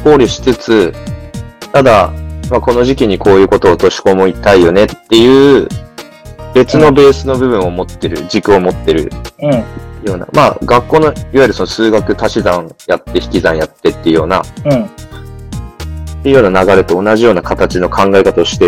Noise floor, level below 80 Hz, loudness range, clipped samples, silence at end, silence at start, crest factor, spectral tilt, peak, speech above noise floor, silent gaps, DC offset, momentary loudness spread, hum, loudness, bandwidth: -30 dBFS; -30 dBFS; 5 LU; 2%; 0 s; 0 s; 10 dB; -6 dB/octave; 0 dBFS; 22 dB; none; 0.4%; 17 LU; none; -10 LUFS; 15 kHz